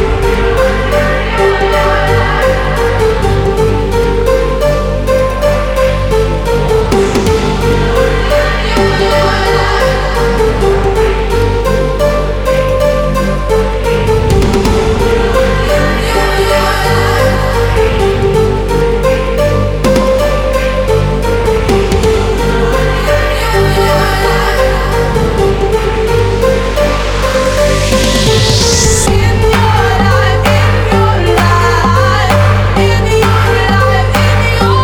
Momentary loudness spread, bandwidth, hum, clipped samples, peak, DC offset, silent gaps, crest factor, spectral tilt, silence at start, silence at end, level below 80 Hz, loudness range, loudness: 3 LU; 17.5 kHz; 50 Hz at -30 dBFS; under 0.1%; 0 dBFS; under 0.1%; none; 10 dB; -5 dB/octave; 0 s; 0 s; -16 dBFS; 2 LU; -10 LUFS